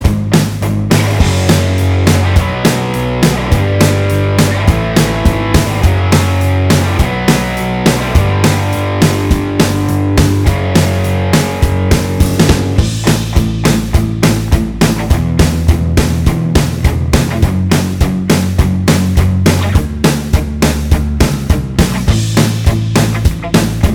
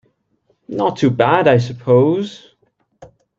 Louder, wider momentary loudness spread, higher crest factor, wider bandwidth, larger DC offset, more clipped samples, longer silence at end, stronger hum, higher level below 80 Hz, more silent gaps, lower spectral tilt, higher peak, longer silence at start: first, -12 LUFS vs -15 LUFS; second, 3 LU vs 10 LU; second, 10 dB vs 16 dB; first, 19 kHz vs 7.6 kHz; neither; first, 0.3% vs under 0.1%; second, 0 s vs 0.35 s; neither; first, -18 dBFS vs -58 dBFS; neither; second, -5.5 dB/octave vs -7.5 dB/octave; about the same, 0 dBFS vs 0 dBFS; second, 0 s vs 0.7 s